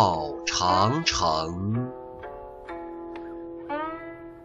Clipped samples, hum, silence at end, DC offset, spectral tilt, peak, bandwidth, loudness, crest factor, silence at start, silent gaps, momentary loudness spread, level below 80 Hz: under 0.1%; none; 0 s; under 0.1%; -4 dB/octave; -8 dBFS; 8.2 kHz; -26 LUFS; 20 dB; 0 s; none; 18 LU; -50 dBFS